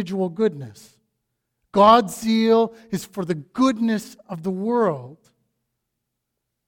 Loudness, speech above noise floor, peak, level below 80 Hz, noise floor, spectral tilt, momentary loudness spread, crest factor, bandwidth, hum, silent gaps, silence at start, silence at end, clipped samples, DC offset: -20 LUFS; 59 dB; 0 dBFS; -60 dBFS; -79 dBFS; -6 dB/octave; 16 LU; 22 dB; 17 kHz; none; none; 0 s; 1.55 s; under 0.1%; under 0.1%